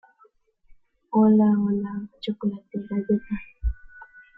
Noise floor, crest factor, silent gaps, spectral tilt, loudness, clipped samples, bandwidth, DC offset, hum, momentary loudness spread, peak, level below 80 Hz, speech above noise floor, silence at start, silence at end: -61 dBFS; 16 dB; none; -10.5 dB/octave; -24 LUFS; under 0.1%; 4.7 kHz; under 0.1%; none; 15 LU; -8 dBFS; -40 dBFS; 38 dB; 1.1 s; 0.35 s